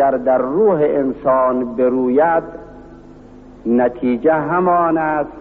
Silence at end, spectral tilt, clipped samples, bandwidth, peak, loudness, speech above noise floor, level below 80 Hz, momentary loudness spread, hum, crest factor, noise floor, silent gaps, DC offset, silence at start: 0 s; -7.5 dB/octave; under 0.1%; 4.1 kHz; -4 dBFS; -16 LUFS; 24 dB; -46 dBFS; 5 LU; none; 12 dB; -39 dBFS; none; under 0.1%; 0 s